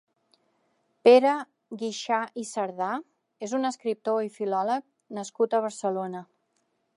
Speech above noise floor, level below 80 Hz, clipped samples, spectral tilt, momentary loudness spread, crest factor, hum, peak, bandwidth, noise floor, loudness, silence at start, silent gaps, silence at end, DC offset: 48 dB; -86 dBFS; under 0.1%; -4.5 dB/octave; 18 LU; 22 dB; none; -6 dBFS; 11.5 kHz; -74 dBFS; -26 LUFS; 1.05 s; none; 0.75 s; under 0.1%